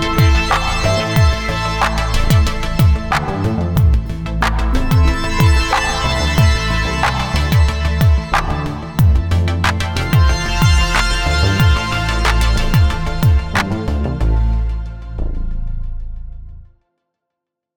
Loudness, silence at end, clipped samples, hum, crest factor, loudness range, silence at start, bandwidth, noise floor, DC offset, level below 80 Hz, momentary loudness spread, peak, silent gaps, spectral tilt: -16 LUFS; 1.1 s; under 0.1%; none; 14 dB; 5 LU; 0 s; over 20 kHz; -80 dBFS; under 0.1%; -18 dBFS; 10 LU; 0 dBFS; none; -5.5 dB/octave